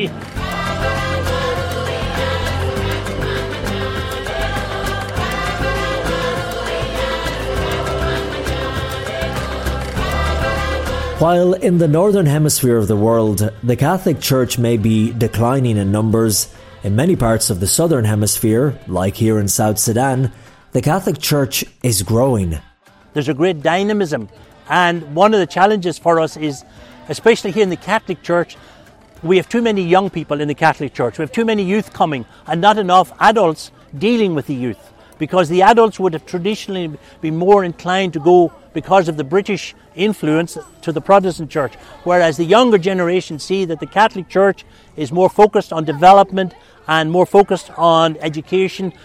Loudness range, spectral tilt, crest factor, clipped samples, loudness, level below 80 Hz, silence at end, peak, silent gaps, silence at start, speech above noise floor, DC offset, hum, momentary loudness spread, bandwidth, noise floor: 6 LU; -5 dB/octave; 16 dB; under 0.1%; -16 LUFS; -34 dBFS; 0.15 s; 0 dBFS; none; 0 s; 29 dB; under 0.1%; none; 10 LU; 16.5 kHz; -44 dBFS